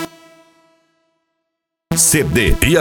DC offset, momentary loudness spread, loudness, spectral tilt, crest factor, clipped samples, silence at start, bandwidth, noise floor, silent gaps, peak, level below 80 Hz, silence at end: under 0.1%; 10 LU; -13 LUFS; -3.5 dB/octave; 18 dB; under 0.1%; 0 s; 19 kHz; -77 dBFS; none; 0 dBFS; -26 dBFS; 0 s